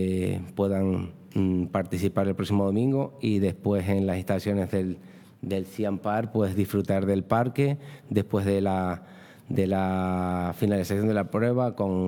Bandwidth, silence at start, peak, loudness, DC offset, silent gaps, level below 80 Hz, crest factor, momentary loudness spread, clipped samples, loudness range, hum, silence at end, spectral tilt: 18 kHz; 0 s; -8 dBFS; -27 LUFS; under 0.1%; none; -64 dBFS; 18 dB; 6 LU; under 0.1%; 2 LU; none; 0 s; -8 dB/octave